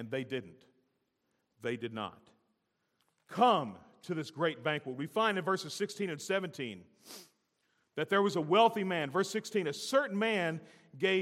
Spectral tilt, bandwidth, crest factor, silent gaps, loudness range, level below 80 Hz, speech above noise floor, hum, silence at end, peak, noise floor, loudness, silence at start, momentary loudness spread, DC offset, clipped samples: -4.5 dB/octave; 16 kHz; 22 dB; none; 5 LU; -86 dBFS; 47 dB; none; 0 s; -12 dBFS; -80 dBFS; -33 LUFS; 0 s; 16 LU; under 0.1%; under 0.1%